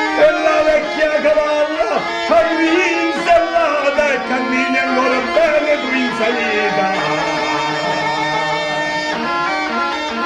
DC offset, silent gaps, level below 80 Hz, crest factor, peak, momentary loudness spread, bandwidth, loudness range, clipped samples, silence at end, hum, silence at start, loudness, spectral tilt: under 0.1%; none; -48 dBFS; 14 dB; -2 dBFS; 5 LU; 10.5 kHz; 3 LU; under 0.1%; 0 s; none; 0 s; -15 LUFS; -4 dB/octave